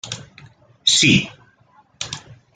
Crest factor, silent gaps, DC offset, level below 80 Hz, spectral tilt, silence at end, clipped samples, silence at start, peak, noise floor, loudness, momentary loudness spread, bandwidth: 22 dB; none; under 0.1%; -50 dBFS; -2.5 dB/octave; 0.2 s; under 0.1%; 0.05 s; -2 dBFS; -55 dBFS; -15 LUFS; 20 LU; 9.6 kHz